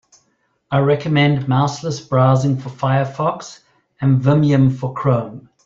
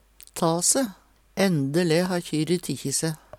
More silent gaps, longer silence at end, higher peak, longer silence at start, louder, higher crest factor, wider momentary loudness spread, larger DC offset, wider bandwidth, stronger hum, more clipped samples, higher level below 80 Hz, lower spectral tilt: neither; about the same, 0.25 s vs 0.25 s; first, -2 dBFS vs -8 dBFS; first, 0.7 s vs 0.35 s; first, -17 LUFS vs -24 LUFS; about the same, 14 dB vs 18 dB; about the same, 8 LU vs 7 LU; neither; second, 7.6 kHz vs 17.5 kHz; neither; neither; first, -52 dBFS vs -60 dBFS; first, -7.5 dB/octave vs -4 dB/octave